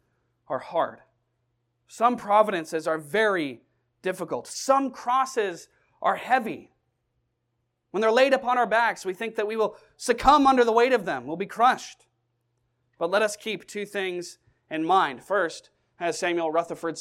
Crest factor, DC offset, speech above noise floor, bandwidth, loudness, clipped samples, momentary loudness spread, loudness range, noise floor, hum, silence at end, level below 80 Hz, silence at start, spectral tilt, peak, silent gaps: 22 dB; under 0.1%; 52 dB; 16.5 kHz; -25 LUFS; under 0.1%; 13 LU; 6 LU; -77 dBFS; none; 0 s; -56 dBFS; 0.5 s; -3.5 dB/octave; -4 dBFS; none